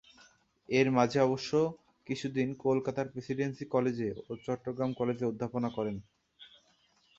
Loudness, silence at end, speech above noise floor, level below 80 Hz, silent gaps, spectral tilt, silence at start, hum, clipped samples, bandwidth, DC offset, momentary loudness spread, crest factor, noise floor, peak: -32 LUFS; 0.7 s; 38 dB; -68 dBFS; none; -6.5 dB/octave; 0.7 s; none; under 0.1%; 7.8 kHz; under 0.1%; 10 LU; 22 dB; -69 dBFS; -12 dBFS